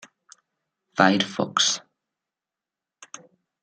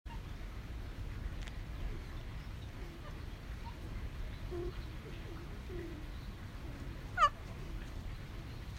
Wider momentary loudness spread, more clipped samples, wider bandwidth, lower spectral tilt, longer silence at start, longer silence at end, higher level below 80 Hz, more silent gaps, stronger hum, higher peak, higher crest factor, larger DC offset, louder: first, 24 LU vs 5 LU; neither; second, 9.8 kHz vs 16 kHz; second, -2.5 dB/octave vs -5.5 dB/octave; first, 0.95 s vs 0.05 s; first, 1.85 s vs 0 s; second, -72 dBFS vs -46 dBFS; neither; neither; first, 0 dBFS vs -18 dBFS; about the same, 26 dB vs 24 dB; neither; first, -22 LUFS vs -43 LUFS